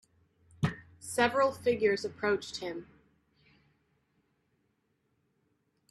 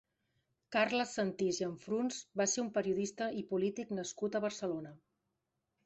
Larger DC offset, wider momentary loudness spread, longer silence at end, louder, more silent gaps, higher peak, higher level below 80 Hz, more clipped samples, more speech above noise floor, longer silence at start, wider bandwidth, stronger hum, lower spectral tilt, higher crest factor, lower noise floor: neither; first, 13 LU vs 7 LU; first, 3.05 s vs 0.9 s; first, -31 LUFS vs -36 LUFS; neither; first, -12 dBFS vs -18 dBFS; first, -68 dBFS vs -76 dBFS; neither; second, 46 dB vs 50 dB; about the same, 0.6 s vs 0.7 s; first, 13 kHz vs 8.2 kHz; neither; about the same, -5 dB/octave vs -4 dB/octave; about the same, 22 dB vs 20 dB; second, -77 dBFS vs -86 dBFS